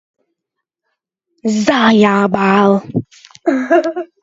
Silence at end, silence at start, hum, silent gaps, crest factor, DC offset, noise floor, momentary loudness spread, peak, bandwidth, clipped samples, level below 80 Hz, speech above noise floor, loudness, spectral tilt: 0.15 s; 1.45 s; none; none; 14 dB; under 0.1%; -79 dBFS; 12 LU; 0 dBFS; 7.8 kHz; under 0.1%; -56 dBFS; 66 dB; -13 LUFS; -6 dB/octave